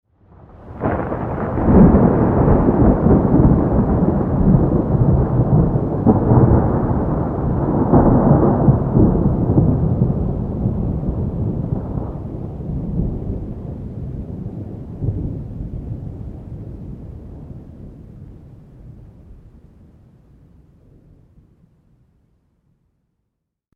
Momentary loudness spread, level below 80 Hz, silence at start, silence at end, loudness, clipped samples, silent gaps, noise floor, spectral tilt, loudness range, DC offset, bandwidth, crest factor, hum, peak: 20 LU; -26 dBFS; 0.6 s; 4.4 s; -17 LUFS; under 0.1%; none; -77 dBFS; -13 dB/octave; 17 LU; under 0.1%; 2.9 kHz; 18 dB; none; 0 dBFS